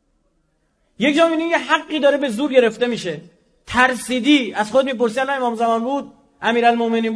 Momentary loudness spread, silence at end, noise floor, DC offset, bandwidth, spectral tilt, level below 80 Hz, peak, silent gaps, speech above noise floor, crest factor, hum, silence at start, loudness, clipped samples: 7 LU; 0 s; -65 dBFS; under 0.1%; 11 kHz; -4 dB/octave; -56 dBFS; 0 dBFS; none; 47 dB; 18 dB; none; 1 s; -18 LUFS; under 0.1%